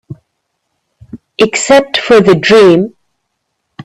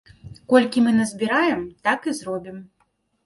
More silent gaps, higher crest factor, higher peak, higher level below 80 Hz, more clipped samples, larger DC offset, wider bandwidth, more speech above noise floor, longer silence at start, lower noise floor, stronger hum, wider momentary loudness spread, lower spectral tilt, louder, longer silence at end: neither; second, 10 dB vs 20 dB; about the same, 0 dBFS vs -2 dBFS; first, -48 dBFS vs -58 dBFS; neither; neither; about the same, 12.5 kHz vs 11.5 kHz; first, 61 dB vs 47 dB; second, 0.1 s vs 0.25 s; about the same, -68 dBFS vs -68 dBFS; neither; second, 9 LU vs 13 LU; about the same, -4.5 dB/octave vs -5 dB/octave; first, -8 LUFS vs -21 LUFS; second, 0 s vs 0.6 s